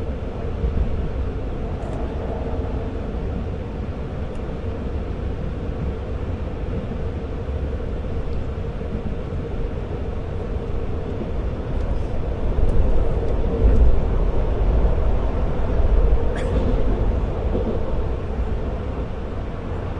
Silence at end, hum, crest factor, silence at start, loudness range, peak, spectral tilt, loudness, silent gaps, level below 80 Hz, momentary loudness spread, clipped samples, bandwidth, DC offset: 0 s; none; 16 dB; 0 s; 6 LU; -4 dBFS; -9 dB/octave; -26 LUFS; none; -24 dBFS; 8 LU; under 0.1%; 5.8 kHz; under 0.1%